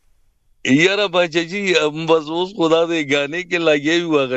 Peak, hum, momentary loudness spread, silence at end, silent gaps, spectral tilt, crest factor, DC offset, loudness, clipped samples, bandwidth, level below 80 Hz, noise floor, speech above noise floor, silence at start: 0 dBFS; none; 5 LU; 0 s; none; -4.5 dB/octave; 18 dB; under 0.1%; -17 LUFS; under 0.1%; 8.2 kHz; -60 dBFS; -57 dBFS; 40 dB; 0.65 s